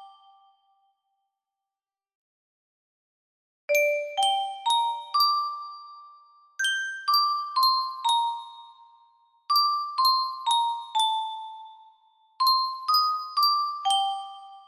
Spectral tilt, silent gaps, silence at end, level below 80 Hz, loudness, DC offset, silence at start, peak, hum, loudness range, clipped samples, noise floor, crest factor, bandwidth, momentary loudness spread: 3.5 dB/octave; 2.15-3.68 s; 0.05 s; -84 dBFS; -24 LUFS; under 0.1%; 0 s; -12 dBFS; none; 3 LU; under 0.1%; under -90 dBFS; 16 dB; 15.5 kHz; 15 LU